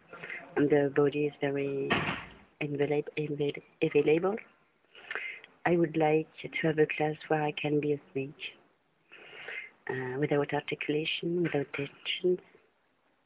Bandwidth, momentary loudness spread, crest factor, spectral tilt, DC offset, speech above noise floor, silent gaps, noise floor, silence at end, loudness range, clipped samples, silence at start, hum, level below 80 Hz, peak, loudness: 4 kHz; 13 LU; 18 dB; -4.5 dB/octave; under 0.1%; 42 dB; none; -72 dBFS; 0.85 s; 4 LU; under 0.1%; 0.1 s; none; -66 dBFS; -14 dBFS; -31 LUFS